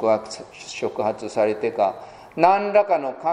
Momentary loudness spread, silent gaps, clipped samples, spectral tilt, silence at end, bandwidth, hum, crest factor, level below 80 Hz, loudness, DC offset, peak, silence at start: 17 LU; none; under 0.1%; -5 dB/octave; 0 s; 10 kHz; none; 20 dB; -64 dBFS; -21 LUFS; under 0.1%; -2 dBFS; 0 s